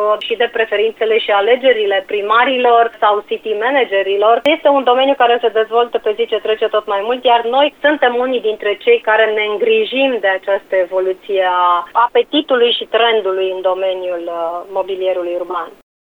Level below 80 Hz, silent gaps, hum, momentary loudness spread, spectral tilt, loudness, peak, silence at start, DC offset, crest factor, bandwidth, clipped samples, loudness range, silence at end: -60 dBFS; none; none; 7 LU; -4 dB/octave; -14 LUFS; 0 dBFS; 0 s; under 0.1%; 14 dB; 4.9 kHz; under 0.1%; 2 LU; 0.5 s